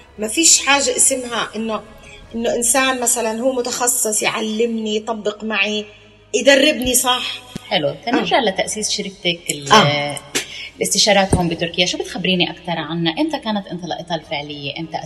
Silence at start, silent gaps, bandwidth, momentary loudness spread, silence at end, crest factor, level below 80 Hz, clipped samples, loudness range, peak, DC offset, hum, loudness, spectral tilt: 0.15 s; none; 14.5 kHz; 13 LU; 0 s; 18 dB; -44 dBFS; under 0.1%; 3 LU; 0 dBFS; under 0.1%; none; -17 LUFS; -2.5 dB/octave